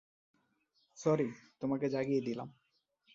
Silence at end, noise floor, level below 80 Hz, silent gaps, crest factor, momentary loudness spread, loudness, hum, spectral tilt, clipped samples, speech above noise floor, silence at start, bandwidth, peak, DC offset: 0.65 s; -77 dBFS; -76 dBFS; none; 20 dB; 10 LU; -36 LUFS; none; -7 dB/octave; under 0.1%; 42 dB; 0.95 s; 7.8 kHz; -18 dBFS; under 0.1%